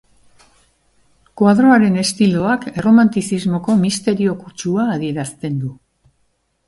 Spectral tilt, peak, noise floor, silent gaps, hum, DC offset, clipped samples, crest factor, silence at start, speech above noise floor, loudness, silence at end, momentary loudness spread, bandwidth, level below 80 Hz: -6 dB/octave; 0 dBFS; -64 dBFS; none; none; under 0.1%; under 0.1%; 16 dB; 1.35 s; 49 dB; -16 LUFS; 0.95 s; 12 LU; 11.5 kHz; -52 dBFS